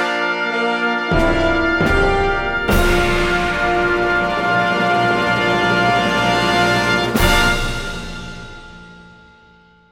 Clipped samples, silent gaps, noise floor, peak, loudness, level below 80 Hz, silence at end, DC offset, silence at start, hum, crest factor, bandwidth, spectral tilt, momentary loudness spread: under 0.1%; none; -49 dBFS; -2 dBFS; -16 LUFS; -26 dBFS; 0.85 s; under 0.1%; 0 s; none; 16 dB; 16.5 kHz; -4.5 dB/octave; 9 LU